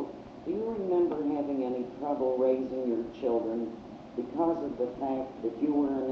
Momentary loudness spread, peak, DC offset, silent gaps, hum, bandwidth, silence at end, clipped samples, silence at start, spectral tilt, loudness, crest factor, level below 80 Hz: 9 LU; -16 dBFS; under 0.1%; none; none; 6.6 kHz; 0 s; under 0.1%; 0 s; -7 dB/octave; -31 LUFS; 14 dB; -64 dBFS